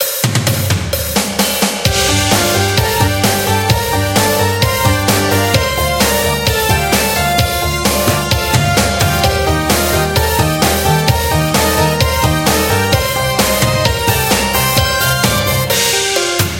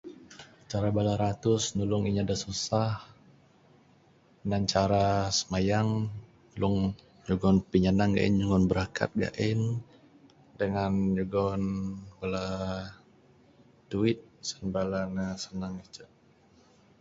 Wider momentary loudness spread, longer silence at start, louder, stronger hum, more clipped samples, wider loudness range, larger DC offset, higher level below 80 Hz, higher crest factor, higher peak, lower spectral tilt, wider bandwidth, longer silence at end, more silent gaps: second, 2 LU vs 14 LU; about the same, 0 s vs 0.05 s; first, -12 LUFS vs -29 LUFS; neither; neither; second, 1 LU vs 7 LU; neither; first, -28 dBFS vs -50 dBFS; second, 12 dB vs 20 dB; first, 0 dBFS vs -8 dBFS; second, -3.5 dB/octave vs -6 dB/octave; first, 17.5 kHz vs 8 kHz; second, 0 s vs 0.95 s; neither